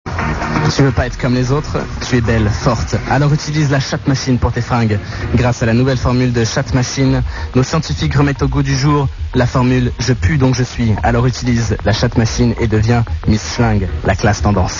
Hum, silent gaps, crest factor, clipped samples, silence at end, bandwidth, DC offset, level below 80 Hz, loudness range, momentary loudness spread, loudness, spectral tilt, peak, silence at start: none; none; 14 dB; under 0.1%; 0 s; 7.4 kHz; 0.2%; -26 dBFS; 1 LU; 4 LU; -15 LUFS; -6 dB/octave; 0 dBFS; 0.05 s